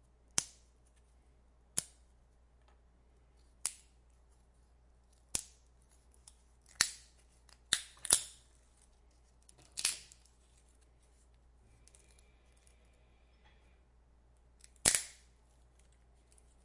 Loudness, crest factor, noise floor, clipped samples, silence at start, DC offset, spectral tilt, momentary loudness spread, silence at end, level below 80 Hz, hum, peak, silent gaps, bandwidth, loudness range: -35 LUFS; 40 dB; -66 dBFS; under 0.1%; 0.35 s; under 0.1%; 0.5 dB/octave; 23 LU; 1.5 s; -64 dBFS; none; -4 dBFS; none; 11.5 kHz; 10 LU